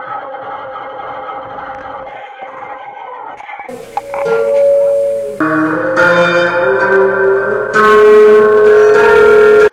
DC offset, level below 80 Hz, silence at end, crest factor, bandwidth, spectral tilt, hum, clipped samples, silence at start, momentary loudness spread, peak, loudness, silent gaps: under 0.1%; -46 dBFS; 0.05 s; 10 dB; 10.5 kHz; -5.5 dB/octave; none; under 0.1%; 0 s; 21 LU; 0 dBFS; -9 LUFS; none